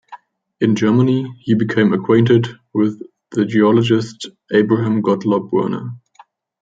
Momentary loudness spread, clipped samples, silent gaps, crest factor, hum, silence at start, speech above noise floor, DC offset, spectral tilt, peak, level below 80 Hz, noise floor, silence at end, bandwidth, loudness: 11 LU; under 0.1%; none; 14 dB; none; 0.1 s; 34 dB; under 0.1%; -7.5 dB/octave; -2 dBFS; -60 dBFS; -49 dBFS; 0.65 s; 7.8 kHz; -16 LUFS